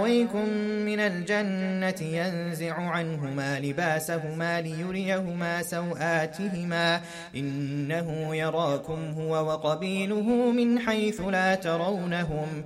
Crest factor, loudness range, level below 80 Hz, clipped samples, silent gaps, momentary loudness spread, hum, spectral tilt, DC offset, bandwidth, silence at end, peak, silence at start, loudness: 16 dB; 3 LU; -58 dBFS; under 0.1%; none; 7 LU; none; -5.5 dB/octave; under 0.1%; 15.5 kHz; 0 s; -12 dBFS; 0 s; -28 LUFS